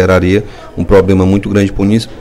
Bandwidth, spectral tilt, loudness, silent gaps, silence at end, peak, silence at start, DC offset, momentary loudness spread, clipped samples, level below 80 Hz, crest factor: 12.5 kHz; -7.5 dB/octave; -11 LUFS; none; 0 s; 0 dBFS; 0 s; under 0.1%; 8 LU; 0.4%; -26 dBFS; 10 dB